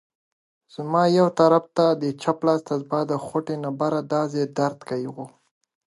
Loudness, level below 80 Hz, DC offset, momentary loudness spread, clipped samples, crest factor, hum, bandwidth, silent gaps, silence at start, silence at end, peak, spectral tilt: -23 LUFS; -72 dBFS; under 0.1%; 13 LU; under 0.1%; 20 dB; none; 11.5 kHz; none; 0.8 s; 0.7 s; -4 dBFS; -7 dB/octave